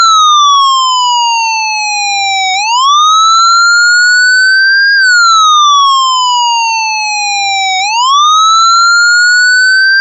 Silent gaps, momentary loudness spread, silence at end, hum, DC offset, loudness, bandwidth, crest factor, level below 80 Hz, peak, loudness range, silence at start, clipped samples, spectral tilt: none; 6 LU; 0 s; none; 0.2%; -6 LUFS; 8.2 kHz; 6 dB; -74 dBFS; -2 dBFS; 3 LU; 0 s; under 0.1%; 6 dB/octave